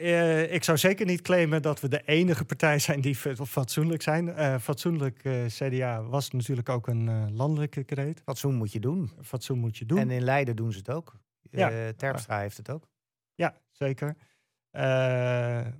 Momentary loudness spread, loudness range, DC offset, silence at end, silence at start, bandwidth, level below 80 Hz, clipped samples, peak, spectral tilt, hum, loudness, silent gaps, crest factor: 9 LU; 7 LU; under 0.1%; 0 s; 0 s; 18 kHz; -72 dBFS; under 0.1%; -10 dBFS; -6 dB/octave; none; -28 LUFS; none; 18 dB